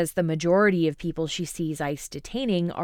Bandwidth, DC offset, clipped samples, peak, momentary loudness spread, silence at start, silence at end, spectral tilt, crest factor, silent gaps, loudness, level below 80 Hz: 17.5 kHz; under 0.1%; under 0.1%; -10 dBFS; 10 LU; 0 s; 0 s; -5.5 dB/octave; 16 dB; none; -25 LUFS; -50 dBFS